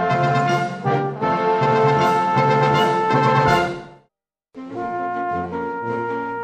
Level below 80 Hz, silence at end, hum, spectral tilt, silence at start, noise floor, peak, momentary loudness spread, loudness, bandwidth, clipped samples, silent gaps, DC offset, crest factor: -52 dBFS; 0 s; none; -6.5 dB/octave; 0 s; -71 dBFS; -2 dBFS; 10 LU; -19 LUFS; 15.5 kHz; under 0.1%; none; under 0.1%; 16 dB